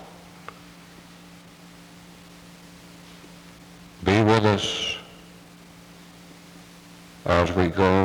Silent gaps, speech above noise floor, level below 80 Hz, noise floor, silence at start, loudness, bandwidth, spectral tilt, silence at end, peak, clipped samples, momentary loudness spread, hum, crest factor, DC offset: none; 27 dB; -52 dBFS; -47 dBFS; 0 s; -22 LUFS; 19.5 kHz; -5.5 dB/octave; 0 s; -6 dBFS; under 0.1%; 27 LU; none; 22 dB; under 0.1%